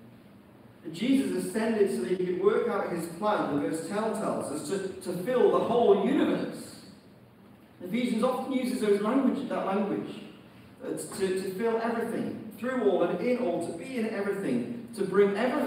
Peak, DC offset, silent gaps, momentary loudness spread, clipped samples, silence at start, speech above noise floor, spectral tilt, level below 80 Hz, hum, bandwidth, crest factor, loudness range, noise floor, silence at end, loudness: -10 dBFS; under 0.1%; none; 12 LU; under 0.1%; 0 s; 26 dB; -6 dB/octave; -72 dBFS; none; 16 kHz; 20 dB; 3 LU; -54 dBFS; 0 s; -29 LUFS